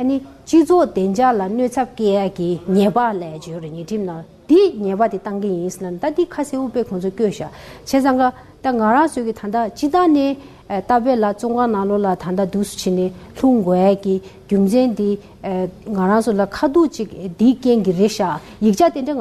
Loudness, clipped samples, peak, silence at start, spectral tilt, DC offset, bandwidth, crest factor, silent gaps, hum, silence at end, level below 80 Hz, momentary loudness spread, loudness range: -18 LUFS; under 0.1%; -4 dBFS; 0 s; -6.5 dB/octave; under 0.1%; 13.5 kHz; 14 dB; none; none; 0 s; -48 dBFS; 10 LU; 3 LU